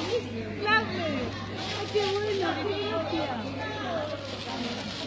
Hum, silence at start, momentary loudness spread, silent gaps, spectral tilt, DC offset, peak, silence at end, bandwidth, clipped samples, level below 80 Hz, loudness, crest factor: none; 0 s; 9 LU; none; -5 dB/octave; under 0.1%; -10 dBFS; 0 s; 8 kHz; under 0.1%; -52 dBFS; -30 LUFS; 20 dB